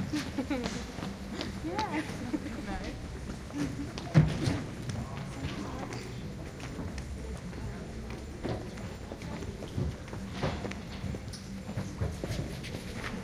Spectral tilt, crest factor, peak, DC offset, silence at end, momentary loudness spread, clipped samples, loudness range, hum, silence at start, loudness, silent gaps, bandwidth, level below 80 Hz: -6 dB/octave; 26 dB; -10 dBFS; under 0.1%; 0 s; 8 LU; under 0.1%; 7 LU; none; 0 s; -36 LUFS; none; 16 kHz; -46 dBFS